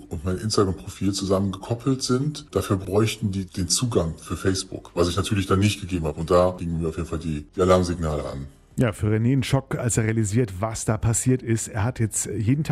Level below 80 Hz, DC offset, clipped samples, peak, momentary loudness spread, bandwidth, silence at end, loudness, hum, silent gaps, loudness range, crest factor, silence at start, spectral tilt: -44 dBFS; under 0.1%; under 0.1%; -6 dBFS; 8 LU; 15 kHz; 0 s; -24 LUFS; none; none; 1 LU; 18 dB; 0 s; -5.5 dB/octave